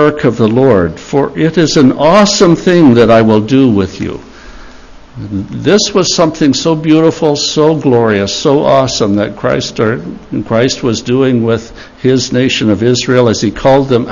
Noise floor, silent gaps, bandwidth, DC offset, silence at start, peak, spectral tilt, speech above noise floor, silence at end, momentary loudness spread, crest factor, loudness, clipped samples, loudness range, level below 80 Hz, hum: -33 dBFS; none; 7.4 kHz; under 0.1%; 0 s; 0 dBFS; -5.5 dB/octave; 24 dB; 0 s; 9 LU; 10 dB; -10 LUFS; 0.7%; 5 LU; -38 dBFS; none